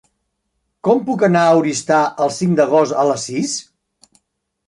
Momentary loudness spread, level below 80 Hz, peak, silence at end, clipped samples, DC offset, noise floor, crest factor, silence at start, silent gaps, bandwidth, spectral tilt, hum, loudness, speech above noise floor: 8 LU; -64 dBFS; -2 dBFS; 1.05 s; under 0.1%; under 0.1%; -71 dBFS; 16 dB; 0.85 s; none; 11.5 kHz; -5 dB/octave; none; -16 LUFS; 56 dB